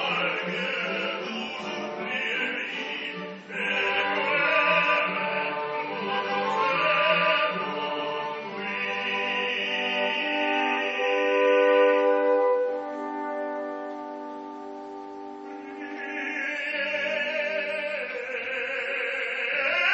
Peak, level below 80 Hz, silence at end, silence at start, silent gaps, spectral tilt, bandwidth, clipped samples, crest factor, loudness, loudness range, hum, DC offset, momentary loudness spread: -10 dBFS; -78 dBFS; 0 s; 0 s; none; -0.5 dB/octave; 8 kHz; under 0.1%; 18 dB; -26 LUFS; 8 LU; none; under 0.1%; 15 LU